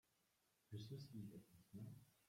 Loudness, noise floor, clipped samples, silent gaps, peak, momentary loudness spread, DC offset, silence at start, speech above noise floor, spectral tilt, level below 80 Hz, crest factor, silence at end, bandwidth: -58 LUFS; -84 dBFS; under 0.1%; none; -44 dBFS; 7 LU; under 0.1%; 0.7 s; 28 dB; -7 dB/octave; -84 dBFS; 16 dB; 0 s; 16.5 kHz